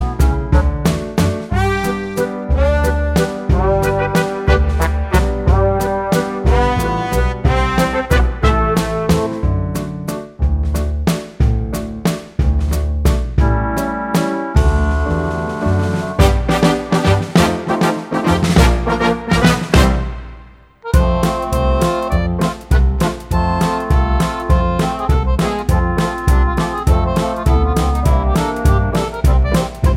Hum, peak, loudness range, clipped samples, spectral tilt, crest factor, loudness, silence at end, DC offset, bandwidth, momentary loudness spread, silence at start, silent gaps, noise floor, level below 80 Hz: none; 0 dBFS; 3 LU; under 0.1%; -6.5 dB/octave; 14 dB; -16 LUFS; 0 s; under 0.1%; 16 kHz; 5 LU; 0 s; none; -40 dBFS; -18 dBFS